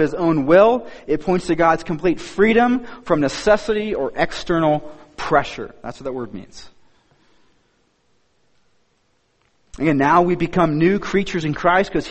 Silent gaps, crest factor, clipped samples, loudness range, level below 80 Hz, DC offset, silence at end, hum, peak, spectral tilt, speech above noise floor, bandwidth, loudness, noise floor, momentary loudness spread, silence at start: none; 18 dB; under 0.1%; 13 LU; -44 dBFS; under 0.1%; 0 s; none; -2 dBFS; -6.5 dB/octave; 46 dB; 8.8 kHz; -18 LUFS; -64 dBFS; 15 LU; 0 s